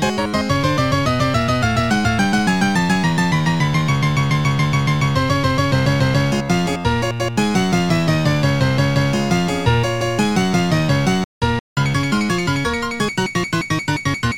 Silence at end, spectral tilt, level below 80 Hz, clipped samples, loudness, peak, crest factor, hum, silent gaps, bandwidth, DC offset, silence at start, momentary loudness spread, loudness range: 0 s; -5.5 dB/octave; -36 dBFS; under 0.1%; -18 LUFS; -4 dBFS; 14 dB; none; 11.24-11.41 s, 11.60-11.76 s; 16.5 kHz; 0.9%; 0 s; 4 LU; 2 LU